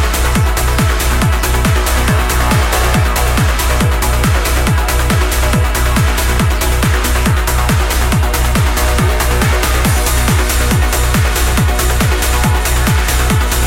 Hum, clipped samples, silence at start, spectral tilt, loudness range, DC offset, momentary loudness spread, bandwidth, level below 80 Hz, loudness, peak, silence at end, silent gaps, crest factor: none; under 0.1%; 0 s; -4 dB/octave; 0 LU; under 0.1%; 1 LU; 17 kHz; -14 dBFS; -13 LUFS; 0 dBFS; 0 s; none; 12 dB